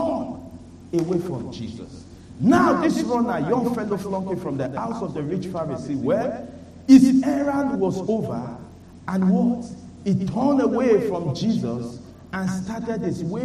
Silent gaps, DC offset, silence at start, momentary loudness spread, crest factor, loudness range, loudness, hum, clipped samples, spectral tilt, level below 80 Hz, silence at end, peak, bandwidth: none; under 0.1%; 0 s; 17 LU; 20 dB; 5 LU; -22 LUFS; none; under 0.1%; -7.5 dB/octave; -52 dBFS; 0 s; -2 dBFS; 12.5 kHz